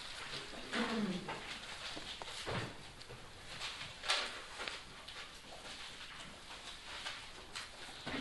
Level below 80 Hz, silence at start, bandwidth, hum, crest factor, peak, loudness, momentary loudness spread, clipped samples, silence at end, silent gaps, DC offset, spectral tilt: -62 dBFS; 0 s; 11.5 kHz; none; 30 dB; -16 dBFS; -43 LUFS; 13 LU; under 0.1%; 0 s; none; under 0.1%; -3 dB/octave